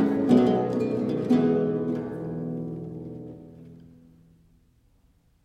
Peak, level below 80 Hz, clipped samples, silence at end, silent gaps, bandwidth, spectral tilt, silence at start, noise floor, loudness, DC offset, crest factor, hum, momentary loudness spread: -8 dBFS; -62 dBFS; under 0.1%; 1.7 s; none; 8.6 kHz; -9 dB/octave; 0 s; -63 dBFS; -25 LUFS; under 0.1%; 20 dB; none; 20 LU